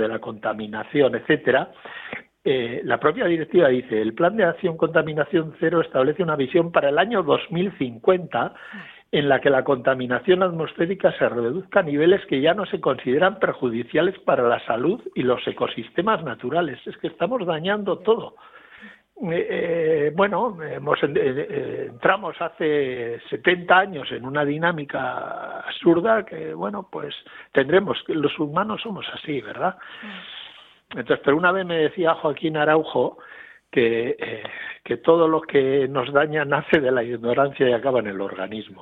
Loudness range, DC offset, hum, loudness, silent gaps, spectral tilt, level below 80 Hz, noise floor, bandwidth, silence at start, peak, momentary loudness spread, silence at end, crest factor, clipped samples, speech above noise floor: 4 LU; under 0.1%; none; -22 LUFS; none; -9 dB/octave; -62 dBFS; -46 dBFS; 4.1 kHz; 0 s; -2 dBFS; 12 LU; 0 s; 20 dB; under 0.1%; 25 dB